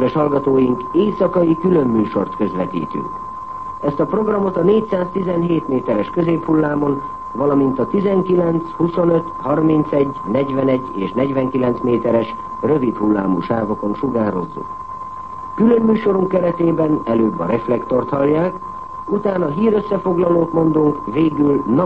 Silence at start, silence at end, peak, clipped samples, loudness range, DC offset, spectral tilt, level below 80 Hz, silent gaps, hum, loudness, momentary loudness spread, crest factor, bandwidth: 0 s; 0 s; -2 dBFS; under 0.1%; 2 LU; 0.7%; -10 dB/octave; -48 dBFS; none; none; -17 LUFS; 9 LU; 14 dB; 5.4 kHz